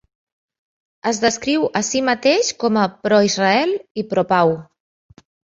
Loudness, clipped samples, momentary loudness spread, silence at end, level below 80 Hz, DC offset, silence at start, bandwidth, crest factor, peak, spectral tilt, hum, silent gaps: -18 LUFS; under 0.1%; 7 LU; 0.95 s; -60 dBFS; under 0.1%; 1.05 s; 8 kHz; 18 dB; -2 dBFS; -3.5 dB/octave; none; 3.91-3.95 s